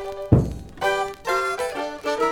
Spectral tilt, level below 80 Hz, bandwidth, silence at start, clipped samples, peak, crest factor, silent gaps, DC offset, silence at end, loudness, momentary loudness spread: -6 dB/octave; -38 dBFS; 18 kHz; 0 s; under 0.1%; -2 dBFS; 20 dB; none; under 0.1%; 0 s; -24 LUFS; 7 LU